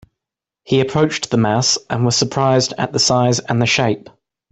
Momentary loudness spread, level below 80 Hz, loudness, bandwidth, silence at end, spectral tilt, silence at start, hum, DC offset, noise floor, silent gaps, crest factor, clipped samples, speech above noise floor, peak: 4 LU; -52 dBFS; -16 LUFS; 8.4 kHz; 0.5 s; -4 dB/octave; 0.7 s; none; under 0.1%; -85 dBFS; none; 14 dB; under 0.1%; 69 dB; -2 dBFS